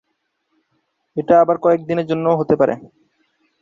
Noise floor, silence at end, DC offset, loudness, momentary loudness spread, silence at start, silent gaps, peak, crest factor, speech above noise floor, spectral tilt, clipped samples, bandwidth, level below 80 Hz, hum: -71 dBFS; 0.75 s; under 0.1%; -16 LUFS; 14 LU; 1.15 s; none; -2 dBFS; 18 dB; 55 dB; -9 dB/octave; under 0.1%; 7.2 kHz; -58 dBFS; none